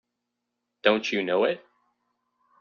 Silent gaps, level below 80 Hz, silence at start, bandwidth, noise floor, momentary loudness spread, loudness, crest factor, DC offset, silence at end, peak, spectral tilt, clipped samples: none; -74 dBFS; 0.85 s; 7 kHz; -82 dBFS; 4 LU; -25 LUFS; 24 dB; under 0.1%; 1 s; -6 dBFS; -2 dB/octave; under 0.1%